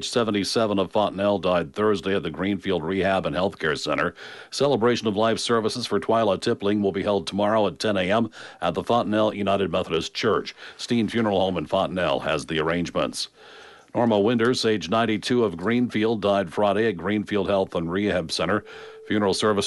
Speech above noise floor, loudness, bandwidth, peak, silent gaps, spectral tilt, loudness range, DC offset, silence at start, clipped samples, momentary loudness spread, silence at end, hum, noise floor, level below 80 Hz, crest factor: 24 dB; -23 LUFS; 11.5 kHz; -8 dBFS; none; -5 dB/octave; 2 LU; under 0.1%; 0 s; under 0.1%; 5 LU; 0 s; none; -47 dBFS; -56 dBFS; 14 dB